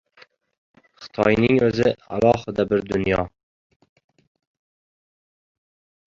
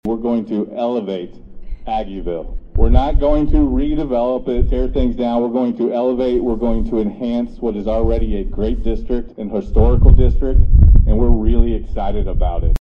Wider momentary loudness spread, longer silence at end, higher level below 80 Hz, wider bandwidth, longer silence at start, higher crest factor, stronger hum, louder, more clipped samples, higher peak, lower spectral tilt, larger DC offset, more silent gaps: second, 7 LU vs 11 LU; first, 2.85 s vs 0.05 s; second, -48 dBFS vs -16 dBFS; first, 7.8 kHz vs 4.1 kHz; first, 1 s vs 0.05 s; first, 22 dB vs 14 dB; neither; about the same, -20 LUFS vs -18 LUFS; second, under 0.1% vs 0.2%; about the same, -2 dBFS vs 0 dBFS; second, -7 dB/octave vs -10.5 dB/octave; neither; neither